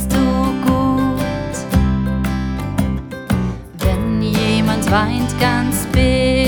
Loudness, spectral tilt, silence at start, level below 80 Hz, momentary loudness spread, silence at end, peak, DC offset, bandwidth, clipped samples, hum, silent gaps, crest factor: -17 LUFS; -6 dB/octave; 0 s; -26 dBFS; 6 LU; 0 s; -2 dBFS; under 0.1%; over 20 kHz; under 0.1%; none; none; 16 dB